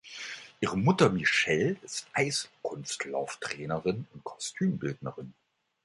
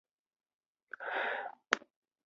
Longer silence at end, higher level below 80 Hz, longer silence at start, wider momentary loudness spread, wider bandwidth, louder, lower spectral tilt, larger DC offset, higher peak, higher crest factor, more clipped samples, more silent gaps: about the same, 0.55 s vs 0.45 s; first, -62 dBFS vs under -90 dBFS; second, 0.05 s vs 1 s; first, 16 LU vs 9 LU; first, 11.5 kHz vs 7.2 kHz; first, -30 LUFS vs -37 LUFS; first, -4.5 dB/octave vs 2.5 dB/octave; neither; about the same, -8 dBFS vs -6 dBFS; second, 24 dB vs 34 dB; neither; neither